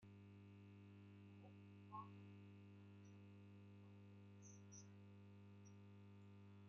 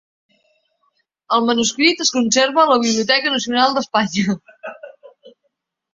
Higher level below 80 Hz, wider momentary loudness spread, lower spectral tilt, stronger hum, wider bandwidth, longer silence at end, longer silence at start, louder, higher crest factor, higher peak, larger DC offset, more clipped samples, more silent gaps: second, under -90 dBFS vs -62 dBFS; second, 5 LU vs 10 LU; first, -7 dB/octave vs -2.5 dB/octave; first, 50 Hz at -65 dBFS vs none; second, 6.6 kHz vs 7.8 kHz; second, 0 s vs 0.65 s; second, 0 s vs 1.3 s; second, -64 LUFS vs -16 LUFS; about the same, 18 dB vs 18 dB; second, -44 dBFS vs -2 dBFS; neither; neither; neither